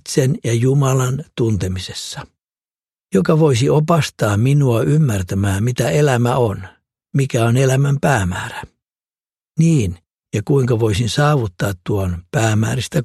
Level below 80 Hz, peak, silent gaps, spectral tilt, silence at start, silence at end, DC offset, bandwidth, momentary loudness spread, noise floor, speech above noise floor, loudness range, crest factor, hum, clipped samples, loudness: -44 dBFS; 0 dBFS; none; -6 dB/octave; 0.05 s; 0 s; under 0.1%; 13.5 kHz; 10 LU; under -90 dBFS; over 74 dB; 3 LU; 16 dB; none; under 0.1%; -17 LUFS